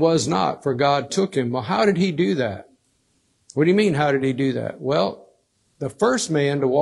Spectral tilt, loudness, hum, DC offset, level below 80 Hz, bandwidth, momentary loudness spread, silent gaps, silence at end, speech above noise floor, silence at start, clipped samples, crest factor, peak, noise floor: -5.5 dB/octave; -21 LUFS; none; under 0.1%; -60 dBFS; 12 kHz; 8 LU; none; 0 s; 46 dB; 0 s; under 0.1%; 16 dB; -4 dBFS; -66 dBFS